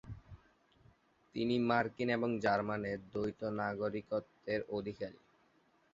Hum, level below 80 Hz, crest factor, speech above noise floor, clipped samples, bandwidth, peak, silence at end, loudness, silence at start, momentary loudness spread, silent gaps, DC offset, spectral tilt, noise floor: none; -66 dBFS; 20 dB; 35 dB; under 0.1%; 7.6 kHz; -18 dBFS; 0.8 s; -37 LUFS; 0.05 s; 12 LU; none; under 0.1%; -5 dB/octave; -71 dBFS